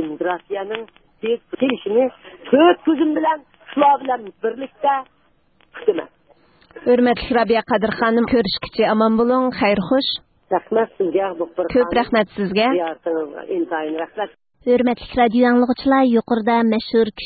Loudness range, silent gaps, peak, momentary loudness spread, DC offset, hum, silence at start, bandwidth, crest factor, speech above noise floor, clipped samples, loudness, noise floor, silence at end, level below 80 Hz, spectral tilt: 4 LU; none; 0 dBFS; 10 LU; under 0.1%; none; 0 s; 4.8 kHz; 18 dB; 41 dB; under 0.1%; -19 LUFS; -59 dBFS; 0 s; -50 dBFS; -10.5 dB/octave